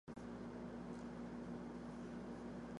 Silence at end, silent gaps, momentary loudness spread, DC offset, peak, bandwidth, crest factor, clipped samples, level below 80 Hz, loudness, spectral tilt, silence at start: 0 s; none; 1 LU; under 0.1%; -38 dBFS; 11 kHz; 12 dB; under 0.1%; -66 dBFS; -51 LUFS; -7 dB/octave; 0.05 s